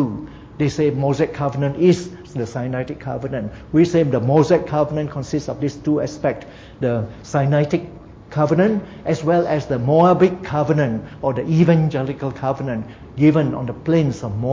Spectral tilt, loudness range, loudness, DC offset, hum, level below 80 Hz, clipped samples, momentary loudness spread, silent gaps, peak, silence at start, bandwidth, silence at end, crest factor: -8 dB/octave; 4 LU; -19 LUFS; under 0.1%; none; -46 dBFS; under 0.1%; 11 LU; none; -2 dBFS; 0 s; 7.8 kHz; 0 s; 16 dB